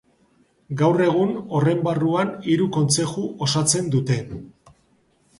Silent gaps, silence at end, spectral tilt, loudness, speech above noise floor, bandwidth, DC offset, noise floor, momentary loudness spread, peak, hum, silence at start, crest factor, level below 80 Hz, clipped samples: none; 0.9 s; -5 dB/octave; -21 LUFS; 41 dB; 11.5 kHz; under 0.1%; -62 dBFS; 7 LU; -4 dBFS; none; 0.7 s; 18 dB; -56 dBFS; under 0.1%